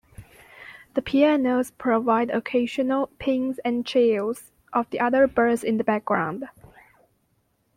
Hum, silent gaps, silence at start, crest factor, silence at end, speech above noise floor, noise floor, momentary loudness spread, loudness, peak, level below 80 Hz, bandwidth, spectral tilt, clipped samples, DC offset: none; none; 0.2 s; 18 dB; 1.25 s; 46 dB; -69 dBFS; 11 LU; -23 LUFS; -6 dBFS; -58 dBFS; 15.5 kHz; -5.5 dB/octave; under 0.1%; under 0.1%